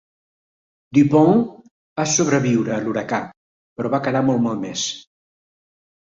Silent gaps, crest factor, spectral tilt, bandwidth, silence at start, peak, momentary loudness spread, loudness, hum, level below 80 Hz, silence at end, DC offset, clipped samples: 1.71-1.96 s, 3.37-3.76 s; 18 dB; -5 dB/octave; 7.8 kHz; 0.9 s; -2 dBFS; 14 LU; -19 LUFS; none; -60 dBFS; 1.15 s; under 0.1%; under 0.1%